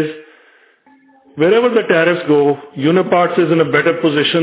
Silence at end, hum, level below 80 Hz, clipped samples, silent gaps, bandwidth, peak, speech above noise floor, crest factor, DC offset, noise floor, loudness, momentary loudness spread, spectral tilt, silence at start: 0 s; none; -64 dBFS; under 0.1%; none; 4 kHz; 0 dBFS; 37 dB; 14 dB; under 0.1%; -50 dBFS; -14 LUFS; 4 LU; -10 dB/octave; 0 s